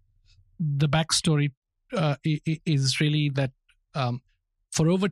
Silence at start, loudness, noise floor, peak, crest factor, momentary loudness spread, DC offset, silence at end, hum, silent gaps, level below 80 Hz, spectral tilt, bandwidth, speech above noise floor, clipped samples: 0.6 s; -26 LUFS; -60 dBFS; -8 dBFS; 18 dB; 10 LU; under 0.1%; 0 s; none; 1.57-1.62 s; -56 dBFS; -5 dB/octave; 13 kHz; 36 dB; under 0.1%